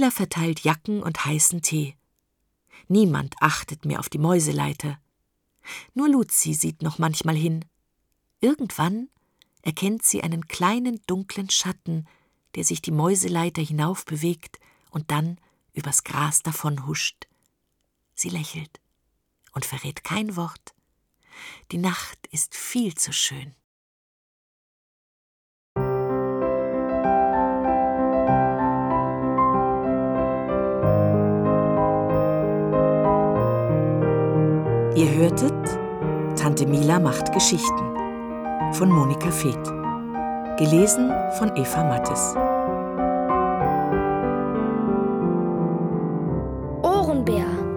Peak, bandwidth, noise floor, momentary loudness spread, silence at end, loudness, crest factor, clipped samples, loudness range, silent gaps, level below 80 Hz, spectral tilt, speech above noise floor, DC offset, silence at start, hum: -2 dBFS; 19.5 kHz; -74 dBFS; 11 LU; 0 s; -23 LUFS; 22 dB; under 0.1%; 8 LU; 23.64-25.76 s; -46 dBFS; -5 dB/octave; 51 dB; under 0.1%; 0 s; none